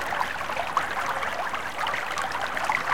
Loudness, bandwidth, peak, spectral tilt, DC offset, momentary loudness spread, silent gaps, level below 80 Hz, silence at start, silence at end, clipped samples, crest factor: -28 LUFS; 17 kHz; -10 dBFS; -2 dB/octave; 1%; 3 LU; none; -56 dBFS; 0 s; 0 s; under 0.1%; 18 dB